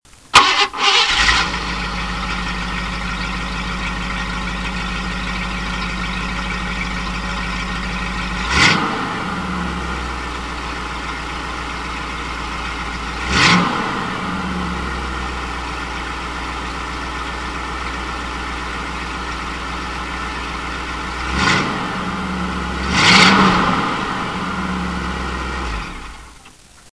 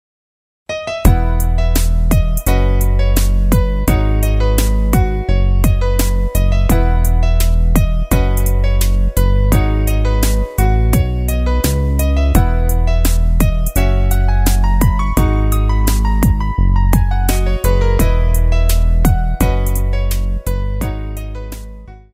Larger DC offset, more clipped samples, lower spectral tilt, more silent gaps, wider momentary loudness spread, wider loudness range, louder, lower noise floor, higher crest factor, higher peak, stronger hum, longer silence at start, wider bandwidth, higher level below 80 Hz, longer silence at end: first, 0.3% vs under 0.1%; neither; second, -3.5 dB/octave vs -6 dB/octave; neither; first, 12 LU vs 4 LU; first, 9 LU vs 1 LU; second, -19 LUFS vs -15 LUFS; first, -44 dBFS vs -33 dBFS; first, 20 dB vs 12 dB; about the same, 0 dBFS vs 0 dBFS; neither; second, 0.05 s vs 0.7 s; second, 11 kHz vs 16 kHz; second, -30 dBFS vs -14 dBFS; about the same, 0.05 s vs 0.15 s